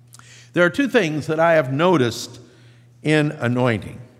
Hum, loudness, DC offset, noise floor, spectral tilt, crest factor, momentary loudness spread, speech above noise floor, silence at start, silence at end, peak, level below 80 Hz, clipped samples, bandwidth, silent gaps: none; -19 LUFS; under 0.1%; -49 dBFS; -6 dB/octave; 18 dB; 10 LU; 30 dB; 0.55 s; 0.15 s; -2 dBFS; -62 dBFS; under 0.1%; 15.5 kHz; none